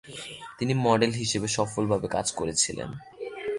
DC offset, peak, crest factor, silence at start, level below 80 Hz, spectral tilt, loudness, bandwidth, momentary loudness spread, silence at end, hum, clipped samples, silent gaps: under 0.1%; -8 dBFS; 20 dB; 0.05 s; -56 dBFS; -4 dB/octave; -26 LUFS; 11.5 kHz; 16 LU; 0 s; none; under 0.1%; none